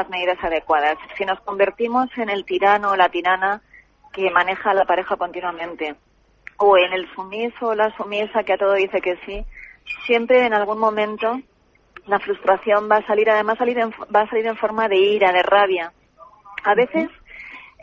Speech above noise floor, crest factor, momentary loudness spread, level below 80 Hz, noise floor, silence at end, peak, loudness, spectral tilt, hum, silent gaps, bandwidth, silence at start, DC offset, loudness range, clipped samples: 29 dB; 16 dB; 14 LU; -50 dBFS; -48 dBFS; 0.2 s; -4 dBFS; -19 LUFS; -5.5 dB/octave; none; none; 7.2 kHz; 0 s; under 0.1%; 3 LU; under 0.1%